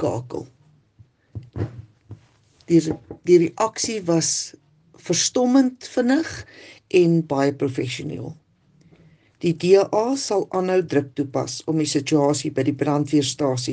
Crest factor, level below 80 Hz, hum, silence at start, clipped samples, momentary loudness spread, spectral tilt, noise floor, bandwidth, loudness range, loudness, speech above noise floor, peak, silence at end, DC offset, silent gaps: 18 dB; -60 dBFS; none; 0 s; under 0.1%; 15 LU; -5 dB/octave; -57 dBFS; 10 kHz; 3 LU; -21 LUFS; 36 dB; -4 dBFS; 0 s; under 0.1%; none